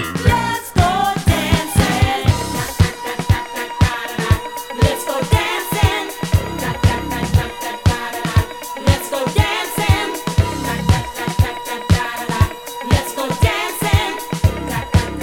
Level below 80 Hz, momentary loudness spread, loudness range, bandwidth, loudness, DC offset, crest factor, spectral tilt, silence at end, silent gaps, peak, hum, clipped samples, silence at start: -28 dBFS; 6 LU; 2 LU; 17.5 kHz; -18 LUFS; under 0.1%; 16 dB; -5 dB/octave; 0 s; none; 0 dBFS; none; under 0.1%; 0 s